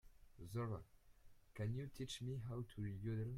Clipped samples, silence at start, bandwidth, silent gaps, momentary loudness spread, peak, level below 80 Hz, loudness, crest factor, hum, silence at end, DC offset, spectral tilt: under 0.1%; 0.05 s; 15.5 kHz; none; 6 LU; -34 dBFS; -64 dBFS; -48 LUFS; 14 dB; none; 0 s; under 0.1%; -6.5 dB/octave